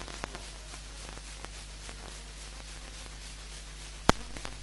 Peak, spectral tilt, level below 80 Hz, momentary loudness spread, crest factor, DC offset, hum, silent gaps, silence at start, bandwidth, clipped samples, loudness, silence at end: 0 dBFS; -3.5 dB/octave; -44 dBFS; 15 LU; 38 dB; under 0.1%; 50 Hz at -45 dBFS; none; 0 s; 11.5 kHz; under 0.1%; -38 LUFS; 0 s